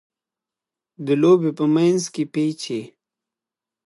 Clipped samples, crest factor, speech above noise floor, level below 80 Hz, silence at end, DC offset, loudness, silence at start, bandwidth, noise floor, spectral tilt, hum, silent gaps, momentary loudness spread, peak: under 0.1%; 18 dB; 69 dB; -74 dBFS; 1 s; under 0.1%; -20 LUFS; 1 s; 11.5 kHz; -88 dBFS; -6 dB/octave; none; none; 13 LU; -4 dBFS